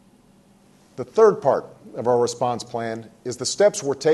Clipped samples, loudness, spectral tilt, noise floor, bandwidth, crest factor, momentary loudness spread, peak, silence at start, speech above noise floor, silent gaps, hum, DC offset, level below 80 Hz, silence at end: under 0.1%; -21 LUFS; -4 dB/octave; -55 dBFS; 12.5 kHz; 18 dB; 16 LU; -4 dBFS; 1 s; 34 dB; none; none; under 0.1%; -66 dBFS; 0 s